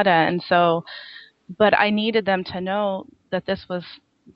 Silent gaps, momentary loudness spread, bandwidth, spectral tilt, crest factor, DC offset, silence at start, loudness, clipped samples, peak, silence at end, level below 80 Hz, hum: none; 16 LU; 5.8 kHz; -8.5 dB/octave; 20 dB; under 0.1%; 0 s; -21 LUFS; under 0.1%; -2 dBFS; 0.4 s; -60 dBFS; none